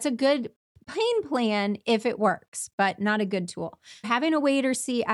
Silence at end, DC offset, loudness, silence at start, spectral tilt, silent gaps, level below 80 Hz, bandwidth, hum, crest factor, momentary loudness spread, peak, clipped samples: 0 s; under 0.1%; -26 LUFS; 0 s; -4 dB/octave; 0.56-0.75 s, 2.48-2.52 s, 2.73-2.78 s; -72 dBFS; 12.5 kHz; none; 16 dB; 12 LU; -10 dBFS; under 0.1%